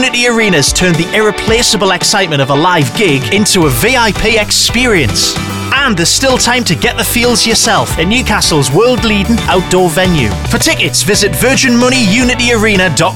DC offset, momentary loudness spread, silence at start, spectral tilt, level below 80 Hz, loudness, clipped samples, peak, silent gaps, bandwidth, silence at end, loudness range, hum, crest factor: 1%; 3 LU; 0 s; -3.5 dB/octave; -26 dBFS; -9 LUFS; under 0.1%; 0 dBFS; none; 18.5 kHz; 0 s; 1 LU; none; 8 dB